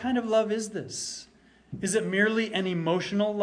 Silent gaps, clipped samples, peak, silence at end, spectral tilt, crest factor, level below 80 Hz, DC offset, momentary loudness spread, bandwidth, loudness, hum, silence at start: none; under 0.1%; -10 dBFS; 0 s; -4.5 dB/octave; 18 dB; -64 dBFS; under 0.1%; 10 LU; 10.5 kHz; -27 LUFS; none; 0 s